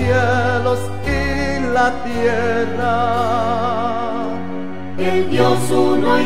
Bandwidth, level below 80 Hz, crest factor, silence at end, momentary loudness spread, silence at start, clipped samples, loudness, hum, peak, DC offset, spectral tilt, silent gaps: 15.5 kHz; -34 dBFS; 16 dB; 0 s; 8 LU; 0 s; under 0.1%; -18 LUFS; none; 0 dBFS; 5%; -6 dB/octave; none